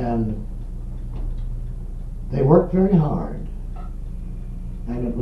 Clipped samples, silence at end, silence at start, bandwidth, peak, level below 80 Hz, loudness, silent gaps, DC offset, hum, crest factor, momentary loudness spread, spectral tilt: under 0.1%; 0 s; 0 s; 5.2 kHz; 0 dBFS; -30 dBFS; -22 LUFS; none; under 0.1%; none; 22 dB; 19 LU; -11 dB/octave